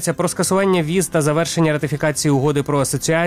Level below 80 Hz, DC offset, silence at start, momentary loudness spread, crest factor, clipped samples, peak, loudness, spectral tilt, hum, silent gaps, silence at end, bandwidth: -48 dBFS; 0.2%; 0 s; 3 LU; 14 dB; under 0.1%; -4 dBFS; -18 LUFS; -5 dB/octave; none; none; 0 s; 16 kHz